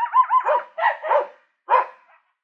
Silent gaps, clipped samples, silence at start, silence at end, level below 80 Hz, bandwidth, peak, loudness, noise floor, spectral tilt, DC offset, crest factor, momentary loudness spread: none; under 0.1%; 0 s; 0.55 s; under -90 dBFS; 5.4 kHz; -4 dBFS; -20 LUFS; -56 dBFS; -1.5 dB/octave; under 0.1%; 16 dB; 8 LU